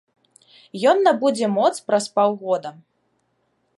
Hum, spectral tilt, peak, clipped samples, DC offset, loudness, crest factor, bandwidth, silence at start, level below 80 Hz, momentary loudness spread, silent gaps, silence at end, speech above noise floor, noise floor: none; -4.5 dB/octave; -4 dBFS; under 0.1%; under 0.1%; -20 LUFS; 18 dB; 11.5 kHz; 0.75 s; -78 dBFS; 9 LU; none; 1.05 s; 49 dB; -69 dBFS